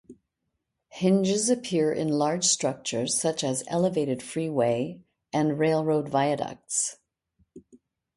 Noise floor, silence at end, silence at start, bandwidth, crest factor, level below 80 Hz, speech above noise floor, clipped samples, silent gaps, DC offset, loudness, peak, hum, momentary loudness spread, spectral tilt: -81 dBFS; 0.4 s; 0.1 s; 11.5 kHz; 16 dB; -68 dBFS; 55 dB; under 0.1%; none; under 0.1%; -26 LUFS; -10 dBFS; none; 7 LU; -4 dB/octave